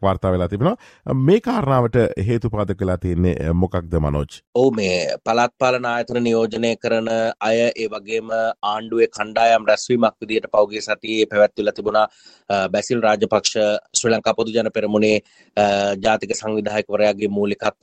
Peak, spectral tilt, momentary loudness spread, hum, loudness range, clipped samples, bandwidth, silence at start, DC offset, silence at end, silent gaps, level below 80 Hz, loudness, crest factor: -4 dBFS; -5 dB/octave; 6 LU; none; 2 LU; under 0.1%; 9.8 kHz; 0 s; under 0.1%; 0.1 s; 4.47-4.53 s; -44 dBFS; -19 LUFS; 16 dB